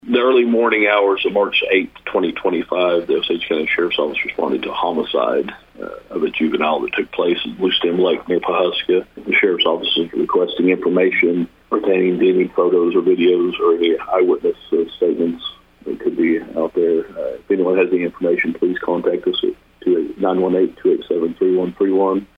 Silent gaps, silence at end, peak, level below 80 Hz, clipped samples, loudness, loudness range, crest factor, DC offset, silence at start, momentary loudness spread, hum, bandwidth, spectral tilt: none; 0.15 s; -2 dBFS; -54 dBFS; under 0.1%; -17 LUFS; 4 LU; 16 dB; under 0.1%; 0.05 s; 7 LU; none; 5 kHz; -7.5 dB/octave